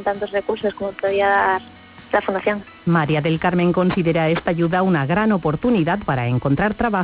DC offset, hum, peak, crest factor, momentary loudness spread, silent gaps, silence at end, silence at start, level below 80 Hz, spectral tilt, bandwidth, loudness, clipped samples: under 0.1%; none; -6 dBFS; 14 dB; 6 LU; none; 0 s; 0 s; -44 dBFS; -11 dB/octave; 4 kHz; -19 LUFS; under 0.1%